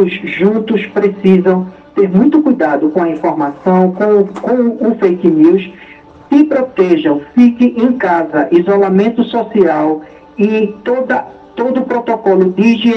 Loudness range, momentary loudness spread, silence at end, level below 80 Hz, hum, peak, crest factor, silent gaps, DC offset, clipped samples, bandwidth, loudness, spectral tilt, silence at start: 3 LU; 7 LU; 0 s; -54 dBFS; none; 0 dBFS; 12 dB; none; under 0.1%; 0.2%; 6.4 kHz; -12 LUFS; -8.5 dB/octave; 0 s